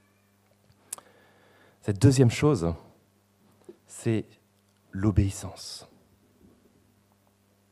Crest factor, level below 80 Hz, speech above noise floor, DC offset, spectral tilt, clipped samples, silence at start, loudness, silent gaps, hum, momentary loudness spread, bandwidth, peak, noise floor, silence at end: 24 dB; -48 dBFS; 41 dB; under 0.1%; -6.5 dB/octave; under 0.1%; 1.85 s; -26 LUFS; none; 50 Hz at -50 dBFS; 20 LU; 14 kHz; -6 dBFS; -65 dBFS; 1.9 s